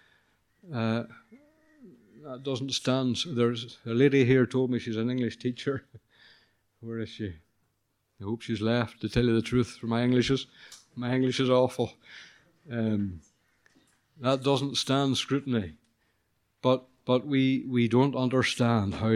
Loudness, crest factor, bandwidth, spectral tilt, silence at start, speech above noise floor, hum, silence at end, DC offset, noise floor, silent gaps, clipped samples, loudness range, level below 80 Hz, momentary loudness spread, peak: -28 LUFS; 20 dB; 12 kHz; -6 dB/octave; 0.65 s; 49 dB; none; 0 s; under 0.1%; -76 dBFS; none; under 0.1%; 7 LU; -56 dBFS; 14 LU; -10 dBFS